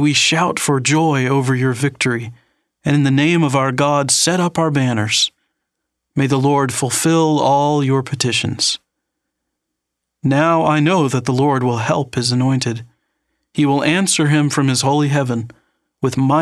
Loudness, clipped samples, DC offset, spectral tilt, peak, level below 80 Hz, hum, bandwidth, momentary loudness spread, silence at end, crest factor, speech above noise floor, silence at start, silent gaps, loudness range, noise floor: -16 LUFS; under 0.1%; under 0.1%; -4.5 dB/octave; 0 dBFS; -58 dBFS; none; 14 kHz; 7 LU; 0 s; 16 dB; 63 dB; 0 s; none; 2 LU; -78 dBFS